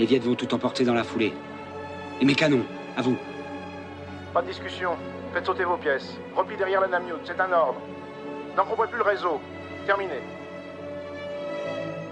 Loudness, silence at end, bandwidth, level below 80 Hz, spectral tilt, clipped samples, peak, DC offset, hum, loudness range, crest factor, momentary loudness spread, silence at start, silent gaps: -27 LUFS; 0 s; 9.4 kHz; -64 dBFS; -6 dB/octave; under 0.1%; -6 dBFS; under 0.1%; none; 4 LU; 20 dB; 15 LU; 0 s; none